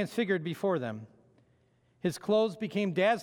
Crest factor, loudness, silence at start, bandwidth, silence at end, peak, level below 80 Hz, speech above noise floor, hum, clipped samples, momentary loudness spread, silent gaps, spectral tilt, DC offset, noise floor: 16 dB; -31 LUFS; 0 s; 18.5 kHz; 0 s; -14 dBFS; -76 dBFS; 38 dB; none; under 0.1%; 8 LU; none; -6 dB/octave; under 0.1%; -68 dBFS